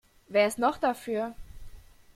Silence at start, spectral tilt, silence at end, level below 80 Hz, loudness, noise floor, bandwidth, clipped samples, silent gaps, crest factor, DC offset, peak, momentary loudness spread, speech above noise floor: 0.3 s; -4 dB/octave; 0.35 s; -52 dBFS; -28 LUFS; -47 dBFS; 16 kHz; under 0.1%; none; 18 dB; under 0.1%; -12 dBFS; 8 LU; 20 dB